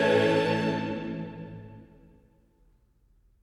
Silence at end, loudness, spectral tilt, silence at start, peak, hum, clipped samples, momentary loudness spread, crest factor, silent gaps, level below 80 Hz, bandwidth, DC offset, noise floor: 1.6 s; -27 LUFS; -6.5 dB/octave; 0 s; -10 dBFS; none; under 0.1%; 22 LU; 20 dB; none; -60 dBFS; 12 kHz; under 0.1%; -64 dBFS